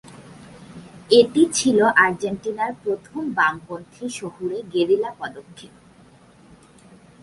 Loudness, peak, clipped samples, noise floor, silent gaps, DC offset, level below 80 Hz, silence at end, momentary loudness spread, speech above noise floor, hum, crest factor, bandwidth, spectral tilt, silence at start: -20 LUFS; -2 dBFS; under 0.1%; -50 dBFS; none; under 0.1%; -60 dBFS; 1.55 s; 21 LU; 30 dB; none; 20 dB; 11.5 kHz; -3.5 dB/octave; 0.1 s